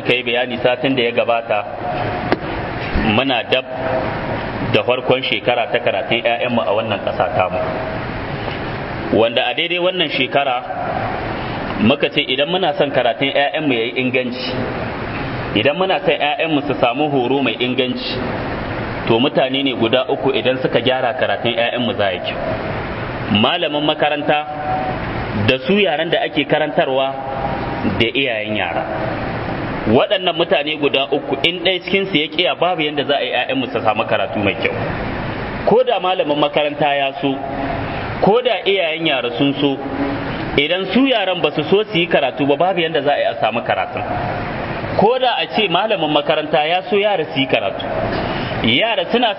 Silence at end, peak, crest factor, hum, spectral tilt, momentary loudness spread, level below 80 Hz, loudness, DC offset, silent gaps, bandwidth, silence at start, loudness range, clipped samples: 0 s; 0 dBFS; 18 dB; none; -8 dB/octave; 7 LU; -40 dBFS; -17 LUFS; under 0.1%; none; 5.8 kHz; 0 s; 2 LU; under 0.1%